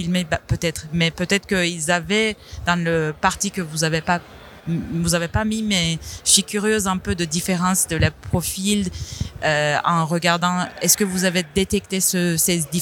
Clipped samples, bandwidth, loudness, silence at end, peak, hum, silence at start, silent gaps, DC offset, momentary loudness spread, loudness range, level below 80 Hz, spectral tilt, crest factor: under 0.1%; 18.5 kHz; -20 LUFS; 0 s; 0 dBFS; none; 0 s; none; under 0.1%; 7 LU; 3 LU; -42 dBFS; -3.5 dB/octave; 20 dB